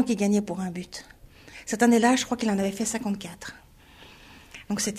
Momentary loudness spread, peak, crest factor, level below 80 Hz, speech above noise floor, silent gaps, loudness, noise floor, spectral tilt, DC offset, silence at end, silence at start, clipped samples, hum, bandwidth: 21 LU; -6 dBFS; 20 dB; -56 dBFS; 26 dB; none; -25 LUFS; -51 dBFS; -4.5 dB/octave; under 0.1%; 0 s; 0 s; under 0.1%; none; 15 kHz